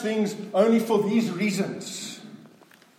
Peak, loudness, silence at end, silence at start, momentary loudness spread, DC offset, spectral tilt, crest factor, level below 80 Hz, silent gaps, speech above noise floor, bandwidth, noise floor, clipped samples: -6 dBFS; -25 LUFS; 0.5 s; 0 s; 14 LU; under 0.1%; -5.5 dB/octave; 20 dB; -80 dBFS; none; 31 dB; 16.5 kHz; -54 dBFS; under 0.1%